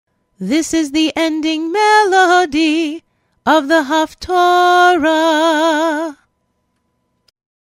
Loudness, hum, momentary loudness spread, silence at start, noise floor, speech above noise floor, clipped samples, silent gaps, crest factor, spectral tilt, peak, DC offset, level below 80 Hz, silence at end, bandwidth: -13 LUFS; none; 9 LU; 0.4 s; -66 dBFS; 53 dB; under 0.1%; none; 14 dB; -3 dB/octave; 0 dBFS; under 0.1%; -50 dBFS; 1.55 s; 16 kHz